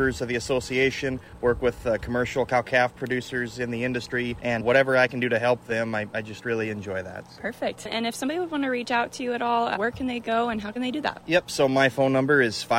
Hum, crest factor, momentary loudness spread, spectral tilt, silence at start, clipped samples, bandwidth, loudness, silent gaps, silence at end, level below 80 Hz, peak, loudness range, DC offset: none; 18 dB; 9 LU; -5 dB/octave; 0 s; under 0.1%; 16 kHz; -25 LUFS; none; 0 s; -50 dBFS; -6 dBFS; 4 LU; under 0.1%